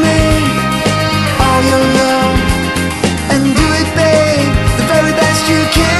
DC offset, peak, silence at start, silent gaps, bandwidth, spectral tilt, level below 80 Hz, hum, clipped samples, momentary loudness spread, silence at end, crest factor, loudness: under 0.1%; 0 dBFS; 0 s; none; 13 kHz; -4.5 dB/octave; -22 dBFS; none; under 0.1%; 3 LU; 0 s; 10 dB; -11 LUFS